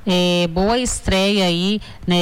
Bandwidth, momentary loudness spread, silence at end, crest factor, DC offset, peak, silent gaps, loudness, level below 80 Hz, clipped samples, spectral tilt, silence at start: 15.5 kHz; 4 LU; 0 s; 8 dB; under 0.1%; -8 dBFS; none; -18 LUFS; -34 dBFS; under 0.1%; -4.5 dB/octave; 0 s